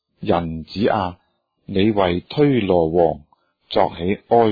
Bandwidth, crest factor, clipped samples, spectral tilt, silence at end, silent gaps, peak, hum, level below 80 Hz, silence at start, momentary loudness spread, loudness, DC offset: 5 kHz; 16 dB; under 0.1%; -9.5 dB/octave; 0 s; none; -2 dBFS; none; -46 dBFS; 0.2 s; 9 LU; -19 LUFS; under 0.1%